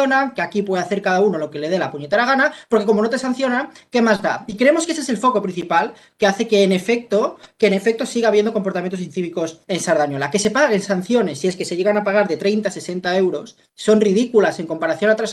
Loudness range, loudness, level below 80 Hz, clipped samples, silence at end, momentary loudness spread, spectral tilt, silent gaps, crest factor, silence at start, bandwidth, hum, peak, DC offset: 2 LU; -18 LUFS; -62 dBFS; under 0.1%; 0 s; 8 LU; -5 dB/octave; none; 16 dB; 0 s; 12.5 kHz; none; -2 dBFS; under 0.1%